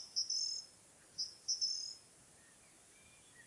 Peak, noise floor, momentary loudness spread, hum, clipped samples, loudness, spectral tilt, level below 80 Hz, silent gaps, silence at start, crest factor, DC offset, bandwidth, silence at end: -26 dBFS; -64 dBFS; 25 LU; none; under 0.1%; -39 LUFS; 2 dB/octave; -84 dBFS; none; 0 s; 20 dB; under 0.1%; 12 kHz; 0 s